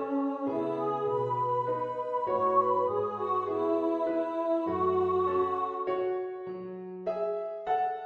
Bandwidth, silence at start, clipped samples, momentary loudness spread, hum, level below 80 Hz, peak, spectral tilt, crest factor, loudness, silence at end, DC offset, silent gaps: 6.6 kHz; 0 s; under 0.1%; 8 LU; none; -72 dBFS; -14 dBFS; -8.5 dB/octave; 16 dB; -30 LUFS; 0 s; under 0.1%; none